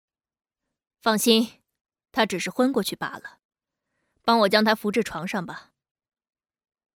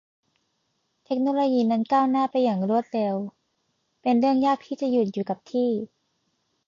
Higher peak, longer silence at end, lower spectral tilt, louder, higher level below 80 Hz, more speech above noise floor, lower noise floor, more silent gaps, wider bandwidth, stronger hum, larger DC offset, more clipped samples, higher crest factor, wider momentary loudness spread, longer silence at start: first, -4 dBFS vs -12 dBFS; first, 1.35 s vs 0.8 s; second, -3.5 dB/octave vs -7.5 dB/octave; about the same, -23 LUFS vs -24 LUFS; first, -66 dBFS vs -74 dBFS; first, 57 dB vs 51 dB; first, -79 dBFS vs -74 dBFS; first, 1.81-1.85 s, 3.45-3.49 s vs none; first, over 20 kHz vs 7.2 kHz; neither; neither; neither; first, 22 dB vs 14 dB; first, 14 LU vs 9 LU; about the same, 1.05 s vs 1.1 s